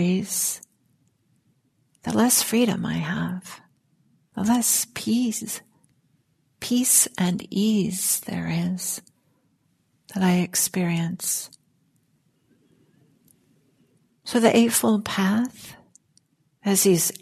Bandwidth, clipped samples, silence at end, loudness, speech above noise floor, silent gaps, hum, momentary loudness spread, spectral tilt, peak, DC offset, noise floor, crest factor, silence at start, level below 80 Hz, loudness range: 14 kHz; under 0.1%; 0.1 s; -22 LUFS; 45 dB; none; none; 17 LU; -4 dB/octave; -4 dBFS; under 0.1%; -68 dBFS; 22 dB; 0 s; -64 dBFS; 4 LU